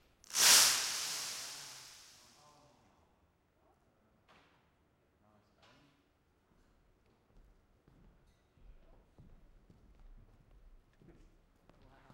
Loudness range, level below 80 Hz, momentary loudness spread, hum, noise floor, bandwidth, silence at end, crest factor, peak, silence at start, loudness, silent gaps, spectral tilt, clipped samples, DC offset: 27 LU; -68 dBFS; 27 LU; none; -74 dBFS; 16.5 kHz; 10.3 s; 30 dB; -10 dBFS; 0.3 s; -28 LUFS; none; 2 dB/octave; under 0.1%; under 0.1%